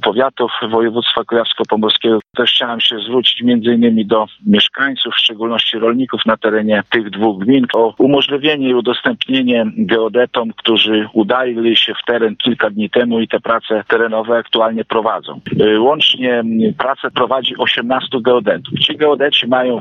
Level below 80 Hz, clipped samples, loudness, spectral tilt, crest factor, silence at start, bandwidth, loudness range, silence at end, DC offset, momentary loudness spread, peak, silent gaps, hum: -58 dBFS; under 0.1%; -14 LUFS; -6 dB/octave; 12 dB; 0 s; 6.6 kHz; 2 LU; 0 s; under 0.1%; 5 LU; -2 dBFS; none; none